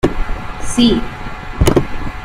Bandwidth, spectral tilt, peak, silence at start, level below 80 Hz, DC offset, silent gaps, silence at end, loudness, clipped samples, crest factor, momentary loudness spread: 16 kHz; -5.5 dB/octave; 0 dBFS; 0.05 s; -22 dBFS; under 0.1%; none; 0 s; -16 LUFS; under 0.1%; 16 dB; 14 LU